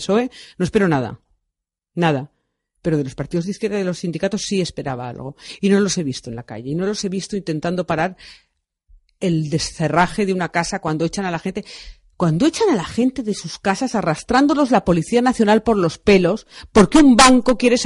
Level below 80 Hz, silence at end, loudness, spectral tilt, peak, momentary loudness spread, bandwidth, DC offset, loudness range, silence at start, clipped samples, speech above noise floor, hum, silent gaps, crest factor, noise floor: -42 dBFS; 0 s; -18 LUFS; -5 dB/octave; 0 dBFS; 12 LU; 11.5 kHz; under 0.1%; 8 LU; 0 s; under 0.1%; 63 dB; none; none; 18 dB; -81 dBFS